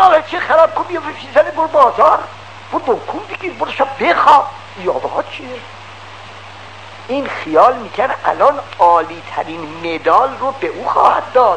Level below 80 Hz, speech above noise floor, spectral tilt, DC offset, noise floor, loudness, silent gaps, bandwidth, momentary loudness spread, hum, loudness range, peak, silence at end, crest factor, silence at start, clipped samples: -56 dBFS; 20 dB; -5 dB/octave; 0.6%; -34 dBFS; -14 LUFS; none; 9.8 kHz; 22 LU; none; 5 LU; 0 dBFS; 0 s; 14 dB; 0 s; 0.3%